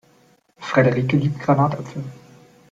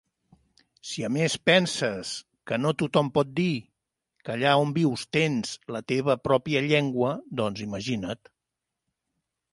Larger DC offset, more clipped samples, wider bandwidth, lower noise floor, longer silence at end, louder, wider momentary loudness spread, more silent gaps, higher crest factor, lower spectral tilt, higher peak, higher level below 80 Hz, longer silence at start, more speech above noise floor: neither; neither; second, 7.8 kHz vs 11.5 kHz; second, -57 dBFS vs -85 dBFS; second, 0.55 s vs 1.35 s; first, -19 LUFS vs -26 LUFS; first, 17 LU vs 13 LU; neither; about the same, 18 dB vs 22 dB; first, -8 dB/octave vs -5 dB/octave; about the same, -4 dBFS vs -6 dBFS; about the same, -58 dBFS vs -62 dBFS; second, 0.6 s vs 0.85 s; second, 38 dB vs 60 dB